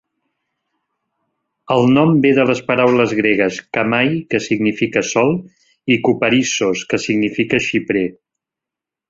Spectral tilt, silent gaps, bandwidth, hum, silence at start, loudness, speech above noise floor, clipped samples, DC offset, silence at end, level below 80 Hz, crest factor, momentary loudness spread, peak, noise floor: -5 dB/octave; none; 7.8 kHz; none; 1.7 s; -16 LUFS; 70 dB; under 0.1%; under 0.1%; 0.95 s; -54 dBFS; 16 dB; 7 LU; -2 dBFS; -86 dBFS